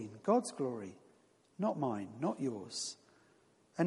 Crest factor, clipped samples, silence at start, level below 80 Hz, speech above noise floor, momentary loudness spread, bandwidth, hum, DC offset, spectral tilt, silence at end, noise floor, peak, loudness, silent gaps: 20 dB; under 0.1%; 0 s; -84 dBFS; 32 dB; 14 LU; 11.5 kHz; none; under 0.1%; -5.5 dB/octave; 0 s; -69 dBFS; -18 dBFS; -37 LUFS; none